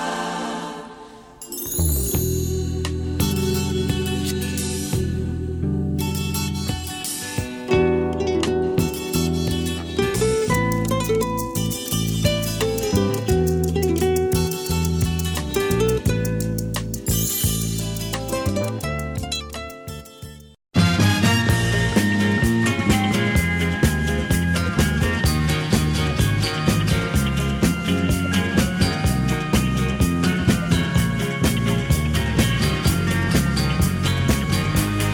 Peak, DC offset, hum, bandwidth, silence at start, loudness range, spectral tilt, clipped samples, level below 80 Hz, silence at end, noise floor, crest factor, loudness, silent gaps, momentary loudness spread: -4 dBFS; under 0.1%; none; over 20 kHz; 0 s; 4 LU; -5 dB/octave; under 0.1%; -32 dBFS; 0 s; -41 dBFS; 16 dB; -21 LUFS; none; 7 LU